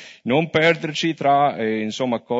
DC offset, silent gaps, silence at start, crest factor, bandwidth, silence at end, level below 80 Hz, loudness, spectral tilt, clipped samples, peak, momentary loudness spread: under 0.1%; none; 0 s; 16 dB; 8 kHz; 0 s; -64 dBFS; -20 LUFS; -5.5 dB/octave; under 0.1%; -4 dBFS; 6 LU